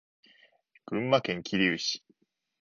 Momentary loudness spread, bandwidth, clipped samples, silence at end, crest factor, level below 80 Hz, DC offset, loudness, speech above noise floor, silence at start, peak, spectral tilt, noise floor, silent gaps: 9 LU; 7.2 kHz; under 0.1%; 0.7 s; 22 dB; -68 dBFS; under 0.1%; -29 LUFS; 42 dB; 0.9 s; -10 dBFS; -4.5 dB/octave; -70 dBFS; none